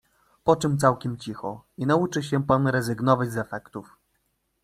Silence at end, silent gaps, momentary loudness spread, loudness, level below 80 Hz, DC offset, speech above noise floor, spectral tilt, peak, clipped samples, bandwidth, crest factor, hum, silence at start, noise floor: 0.8 s; none; 13 LU; -24 LUFS; -56 dBFS; under 0.1%; 49 dB; -6.5 dB/octave; -4 dBFS; under 0.1%; 14.5 kHz; 22 dB; none; 0.45 s; -73 dBFS